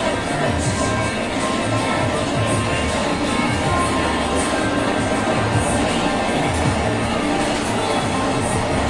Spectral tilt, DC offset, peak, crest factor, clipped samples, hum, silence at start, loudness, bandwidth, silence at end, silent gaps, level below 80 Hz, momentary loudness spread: -4.5 dB/octave; under 0.1%; -6 dBFS; 14 dB; under 0.1%; none; 0 s; -19 LUFS; 11.5 kHz; 0 s; none; -36 dBFS; 2 LU